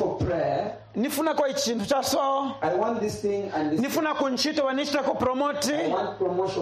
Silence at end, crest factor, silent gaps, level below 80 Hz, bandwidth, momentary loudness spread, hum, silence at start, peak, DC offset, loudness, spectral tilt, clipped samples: 0 s; 14 dB; none; -54 dBFS; 15 kHz; 3 LU; none; 0 s; -12 dBFS; under 0.1%; -26 LUFS; -4 dB/octave; under 0.1%